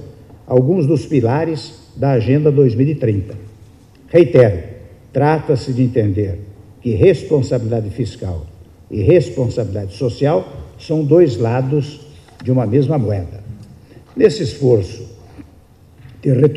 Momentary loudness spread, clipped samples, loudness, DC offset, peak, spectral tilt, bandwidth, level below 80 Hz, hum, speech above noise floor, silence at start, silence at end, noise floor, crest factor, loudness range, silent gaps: 17 LU; under 0.1%; -16 LUFS; under 0.1%; 0 dBFS; -8.5 dB/octave; 10.5 kHz; -46 dBFS; none; 31 dB; 0 s; 0 s; -45 dBFS; 16 dB; 3 LU; none